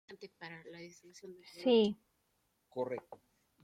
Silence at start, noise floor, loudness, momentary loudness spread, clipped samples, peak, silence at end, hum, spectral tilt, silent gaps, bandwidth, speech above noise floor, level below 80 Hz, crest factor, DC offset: 0.1 s; -79 dBFS; -34 LUFS; 24 LU; under 0.1%; -18 dBFS; 0.5 s; none; -5.5 dB/octave; none; 11.5 kHz; 42 dB; -80 dBFS; 20 dB; under 0.1%